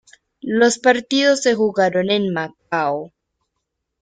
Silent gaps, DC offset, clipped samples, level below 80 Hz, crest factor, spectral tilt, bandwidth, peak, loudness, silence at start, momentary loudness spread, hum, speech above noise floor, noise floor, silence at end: none; under 0.1%; under 0.1%; -64 dBFS; 18 dB; -4 dB/octave; 9.6 kHz; -2 dBFS; -18 LUFS; 0.45 s; 10 LU; none; 59 dB; -77 dBFS; 0.95 s